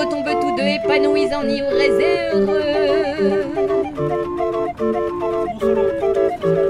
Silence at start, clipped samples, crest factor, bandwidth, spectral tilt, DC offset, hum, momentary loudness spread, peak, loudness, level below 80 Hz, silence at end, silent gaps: 0 s; under 0.1%; 14 dB; 11 kHz; -6 dB/octave; under 0.1%; none; 5 LU; -4 dBFS; -18 LUFS; -44 dBFS; 0 s; none